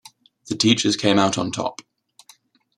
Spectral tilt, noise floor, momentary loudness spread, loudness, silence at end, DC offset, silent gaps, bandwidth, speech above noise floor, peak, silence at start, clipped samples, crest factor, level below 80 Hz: -4 dB/octave; -55 dBFS; 12 LU; -20 LUFS; 0.95 s; under 0.1%; none; 12.5 kHz; 35 dB; -2 dBFS; 0.45 s; under 0.1%; 20 dB; -62 dBFS